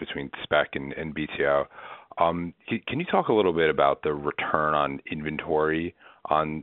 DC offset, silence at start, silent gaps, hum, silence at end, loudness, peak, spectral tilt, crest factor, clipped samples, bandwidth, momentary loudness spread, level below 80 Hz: under 0.1%; 0 s; none; none; 0 s; -26 LUFS; -4 dBFS; -3.5 dB/octave; 24 dB; under 0.1%; 4.2 kHz; 12 LU; -54 dBFS